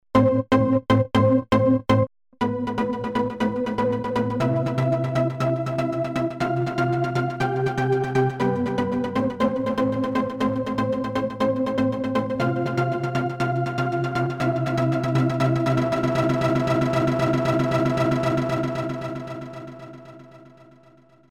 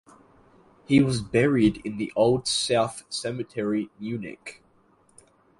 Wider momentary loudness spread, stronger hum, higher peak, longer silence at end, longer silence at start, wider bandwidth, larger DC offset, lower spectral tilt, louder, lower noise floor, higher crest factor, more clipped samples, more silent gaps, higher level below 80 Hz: second, 6 LU vs 12 LU; neither; about the same, -8 dBFS vs -6 dBFS; second, 0.85 s vs 1.05 s; second, 0.15 s vs 0.9 s; about the same, 12 kHz vs 11.5 kHz; neither; first, -7.5 dB/octave vs -5 dB/octave; about the same, -23 LUFS vs -25 LUFS; second, -54 dBFS vs -61 dBFS; second, 14 dB vs 20 dB; neither; neither; about the same, -50 dBFS vs -54 dBFS